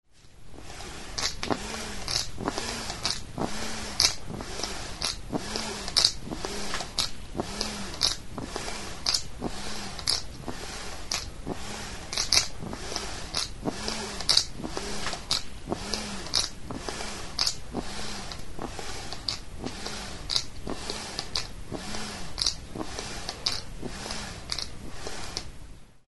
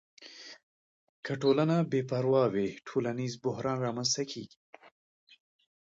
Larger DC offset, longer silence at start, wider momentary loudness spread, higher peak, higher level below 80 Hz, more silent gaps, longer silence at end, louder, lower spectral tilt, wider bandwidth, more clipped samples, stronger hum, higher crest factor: first, 0.8% vs under 0.1%; second, 0 s vs 0.2 s; second, 14 LU vs 21 LU; first, 0 dBFS vs -14 dBFS; first, -44 dBFS vs -72 dBFS; second, none vs 0.63-1.23 s; second, 0 s vs 1.4 s; about the same, -30 LUFS vs -30 LUFS; second, -2 dB/octave vs -5 dB/octave; first, 11.5 kHz vs 8 kHz; neither; neither; first, 32 dB vs 18 dB